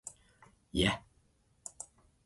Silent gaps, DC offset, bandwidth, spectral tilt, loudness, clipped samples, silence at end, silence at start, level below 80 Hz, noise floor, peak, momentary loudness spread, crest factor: none; under 0.1%; 11.5 kHz; -4 dB/octave; -35 LUFS; under 0.1%; 0.4 s; 0.05 s; -52 dBFS; -70 dBFS; -14 dBFS; 19 LU; 26 dB